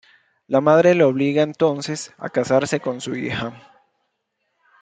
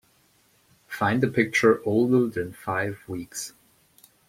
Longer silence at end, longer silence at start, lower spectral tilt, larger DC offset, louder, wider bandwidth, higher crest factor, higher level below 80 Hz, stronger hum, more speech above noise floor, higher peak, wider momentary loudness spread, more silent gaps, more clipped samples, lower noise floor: first, 1.25 s vs 0.8 s; second, 0.5 s vs 0.9 s; about the same, -5.5 dB/octave vs -5.5 dB/octave; neither; first, -19 LUFS vs -24 LUFS; second, 9.4 kHz vs 16.5 kHz; about the same, 18 dB vs 20 dB; about the same, -62 dBFS vs -62 dBFS; neither; first, 55 dB vs 39 dB; first, -2 dBFS vs -6 dBFS; about the same, 13 LU vs 15 LU; neither; neither; first, -74 dBFS vs -63 dBFS